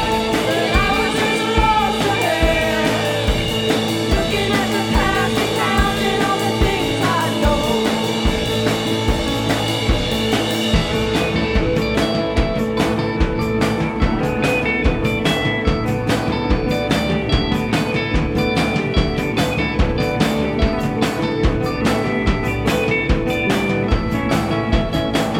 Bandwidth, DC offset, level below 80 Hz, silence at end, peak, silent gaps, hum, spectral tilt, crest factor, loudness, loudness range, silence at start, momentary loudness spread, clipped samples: 19.5 kHz; under 0.1%; -26 dBFS; 0 s; -2 dBFS; none; none; -5 dB/octave; 16 dB; -18 LUFS; 2 LU; 0 s; 3 LU; under 0.1%